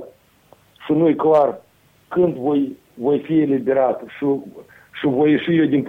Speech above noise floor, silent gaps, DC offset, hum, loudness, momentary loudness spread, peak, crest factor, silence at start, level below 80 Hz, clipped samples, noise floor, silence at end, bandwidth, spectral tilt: 36 dB; none; under 0.1%; none; -19 LUFS; 10 LU; -6 dBFS; 14 dB; 0 s; -60 dBFS; under 0.1%; -53 dBFS; 0 s; 4.1 kHz; -9 dB/octave